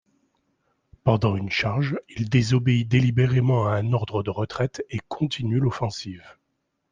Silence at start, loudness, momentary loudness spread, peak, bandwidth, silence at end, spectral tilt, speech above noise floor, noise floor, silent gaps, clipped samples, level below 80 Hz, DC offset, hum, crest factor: 1.05 s; -24 LUFS; 9 LU; -6 dBFS; 7.6 kHz; 0.6 s; -7 dB/octave; 53 dB; -76 dBFS; none; under 0.1%; -52 dBFS; under 0.1%; none; 18 dB